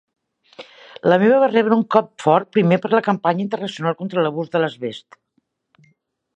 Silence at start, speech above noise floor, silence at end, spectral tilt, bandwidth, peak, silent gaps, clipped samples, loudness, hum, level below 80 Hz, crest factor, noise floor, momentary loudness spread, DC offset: 0.6 s; 51 dB; 1.35 s; -7 dB/octave; 9.4 kHz; 0 dBFS; none; under 0.1%; -18 LUFS; none; -68 dBFS; 20 dB; -69 dBFS; 10 LU; under 0.1%